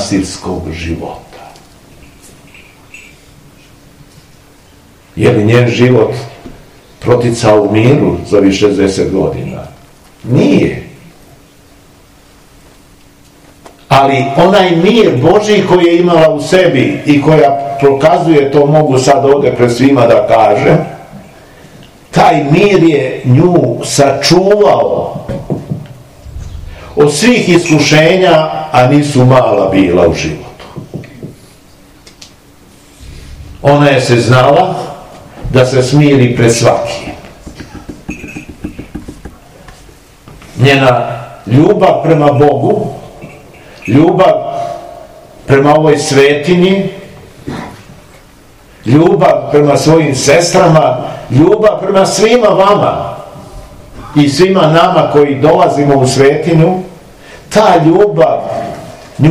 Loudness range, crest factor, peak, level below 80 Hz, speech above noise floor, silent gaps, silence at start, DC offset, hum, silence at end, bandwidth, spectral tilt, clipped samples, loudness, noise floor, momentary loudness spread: 8 LU; 10 dB; 0 dBFS; -38 dBFS; 33 dB; none; 0 s; under 0.1%; none; 0 s; 15.5 kHz; -6 dB/octave; 3%; -8 LUFS; -41 dBFS; 19 LU